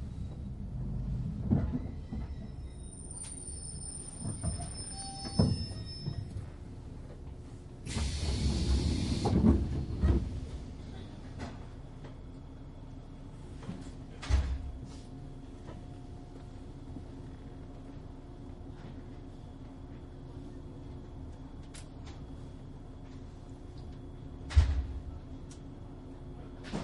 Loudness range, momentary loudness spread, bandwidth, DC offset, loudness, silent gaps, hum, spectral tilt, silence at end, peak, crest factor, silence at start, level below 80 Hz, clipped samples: 15 LU; 17 LU; 11.5 kHz; under 0.1%; -37 LUFS; none; none; -6 dB/octave; 0 s; -12 dBFS; 24 dB; 0 s; -40 dBFS; under 0.1%